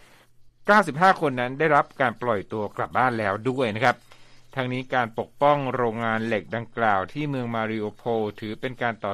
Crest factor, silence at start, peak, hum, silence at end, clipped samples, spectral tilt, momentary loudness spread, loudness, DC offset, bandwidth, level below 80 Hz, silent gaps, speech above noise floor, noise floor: 20 dB; 0.4 s; -4 dBFS; none; 0 s; under 0.1%; -6.5 dB/octave; 11 LU; -24 LUFS; under 0.1%; 13.5 kHz; -58 dBFS; none; 28 dB; -52 dBFS